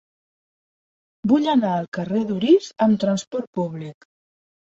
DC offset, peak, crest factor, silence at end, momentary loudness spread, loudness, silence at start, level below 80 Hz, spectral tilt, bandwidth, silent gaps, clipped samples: under 0.1%; -6 dBFS; 16 dB; 0.75 s; 11 LU; -21 LUFS; 1.25 s; -64 dBFS; -6.5 dB/octave; 8 kHz; 1.88-1.92 s, 3.27-3.31 s, 3.47-3.53 s; under 0.1%